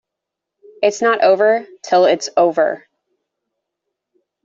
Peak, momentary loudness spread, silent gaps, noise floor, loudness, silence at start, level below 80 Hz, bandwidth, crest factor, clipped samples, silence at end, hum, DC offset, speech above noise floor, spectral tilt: -2 dBFS; 7 LU; none; -82 dBFS; -15 LUFS; 0.8 s; -70 dBFS; 8 kHz; 16 dB; under 0.1%; 1.7 s; none; under 0.1%; 67 dB; -3.5 dB/octave